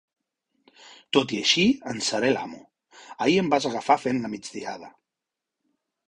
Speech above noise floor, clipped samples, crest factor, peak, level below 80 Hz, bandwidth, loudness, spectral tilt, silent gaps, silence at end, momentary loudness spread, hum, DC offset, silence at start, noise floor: 62 dB; under 0.1%; 22 dB; -4 dBFS; -64 dBFS; 11 kHz; -24 LUFS; -3.5 dB/octave; none; 1.2 s; 15 LU; none; under 0.1%; 0.85 s; -86 dBFS